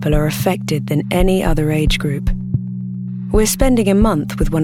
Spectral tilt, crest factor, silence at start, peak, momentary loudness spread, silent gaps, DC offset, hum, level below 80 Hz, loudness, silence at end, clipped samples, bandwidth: -5.5 dB/octave; 14 dB; 0 s; -2 dBFS; 8 LU; none; under 0.1%; none; -22 dBFS; -17 LUFS; 0 s; under 0.1%; 17.5 kHz